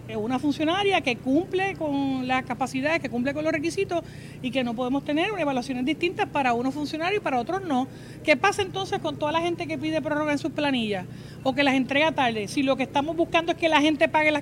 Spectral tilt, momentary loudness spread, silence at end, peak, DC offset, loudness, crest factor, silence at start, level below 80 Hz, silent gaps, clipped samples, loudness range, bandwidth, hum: -5 dB/octave; 7 LU; 0 s; -6 dBFS; under 0.1%; -25 LUFS; 20 dB; 0 s; -56 dBFS; none; under 0.1%; 3 LU; 15.5 kHz; none